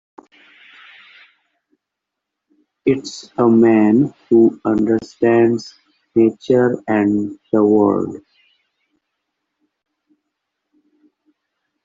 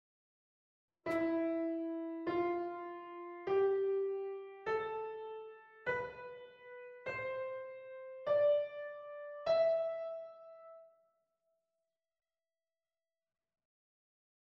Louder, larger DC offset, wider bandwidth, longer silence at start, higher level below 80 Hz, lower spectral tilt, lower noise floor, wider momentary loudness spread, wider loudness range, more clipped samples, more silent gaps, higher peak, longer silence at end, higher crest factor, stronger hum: first, -16 LUFS vs -38 LUFS; neither; about the same, 7.6 kHz vs 7 kHz; first, 2.85 s vs 1.05 s; first, -58 dBFS vs -78 dBFS; about the same, -7.5 dB/octave vs -7 dB/octave; second, -81 dBFS vs under -90 dBFS; second, 10 LU vs 19 LU; about the same, 9 LU vs 7 LU; neither; neither; first, -2 dBFS vs -22 dBFS; about the same, 3.65 s vs 3.6 s; about the same, 16 dB vs 16 dB; neither